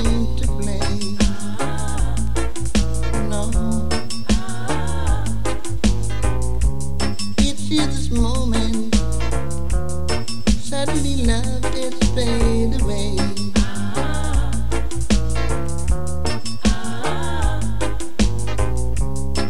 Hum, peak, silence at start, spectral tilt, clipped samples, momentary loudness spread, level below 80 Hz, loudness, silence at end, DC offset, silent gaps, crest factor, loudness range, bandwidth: none; -2 dBFS; 0 s; -5 dB/octave; under 0.1%; 4 LU; -24 dBFS; -22 LUFS; 0 s; 10%; none; 18 dB; 2 LU; 13 kHz